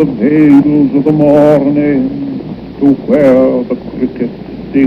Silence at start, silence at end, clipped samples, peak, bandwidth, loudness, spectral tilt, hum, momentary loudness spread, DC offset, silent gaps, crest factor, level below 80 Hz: 0 s; 0 s; 0.4%; 0 dBFS; 5.4 kHz; -10 LUFS; -9.5 dB/octave; none; 13 LU; under 0.1%; none; 10 dB; -40 dBFS